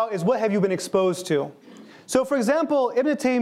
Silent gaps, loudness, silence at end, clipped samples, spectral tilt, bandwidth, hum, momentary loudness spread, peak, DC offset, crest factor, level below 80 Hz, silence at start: none; -23 LUFS; 0 s; under 0.1%; -5.5 dB/octave; 15.5 kHz; none; 4 LU; -4 dBFS; under 0.1%; 18 dB; -66 dBFS; 0 s